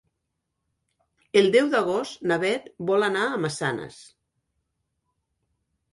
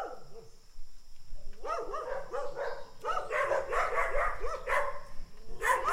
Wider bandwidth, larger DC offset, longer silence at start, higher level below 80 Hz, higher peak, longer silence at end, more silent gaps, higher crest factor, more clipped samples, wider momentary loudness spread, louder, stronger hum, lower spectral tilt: second, 11.5 kHz vs 16 kHz; neither; first, 1.35 s vs 0 s; second, -68 dBFS vs -44 dBFS; first, -6 dBFS vs -14 dBFS; first, 1.9 s vs 0 s; neither; about the same, 20 dB vs 18 dB; neither; second, 10 LU vs 22 LU; first, -23 LUFS vs -34 LUFS; neither; first, -4.5 dB/octave vs -3 dB/octave